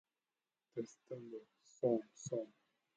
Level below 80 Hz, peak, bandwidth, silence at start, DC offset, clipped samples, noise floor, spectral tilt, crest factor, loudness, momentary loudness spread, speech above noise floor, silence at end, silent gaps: -88 dBFS; -24 dBFS; 9 kHz; 0.75 s; under 0.1%; under 0.1%; under -90 dBFS; -6.5 dB/octave; 22 dB; -43 LUFS; 16 LU; over 48 dB; 0.5 s; none